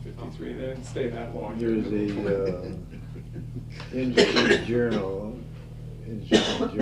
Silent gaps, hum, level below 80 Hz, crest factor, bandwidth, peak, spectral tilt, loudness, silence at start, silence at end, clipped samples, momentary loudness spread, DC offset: none; none; -44 dBFS; 22 dB; 12 kHz; -6 dBFS; -5 dB/octave; -26 LUFS; 0 s; 0 s; under 0.1%; 18 LU; under 0.1%